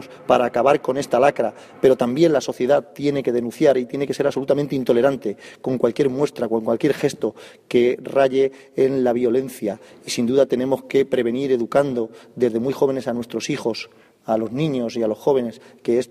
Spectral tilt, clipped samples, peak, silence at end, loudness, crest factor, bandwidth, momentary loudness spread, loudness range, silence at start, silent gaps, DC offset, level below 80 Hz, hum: -6 dB/octave; under 0.1%; -2 dBFS; 0.05 s; -20 LUFS; 18 dB; 15 kHz; 10 LU; 4 LU; 0 s; none; under 0.1%; -60 dBFS; none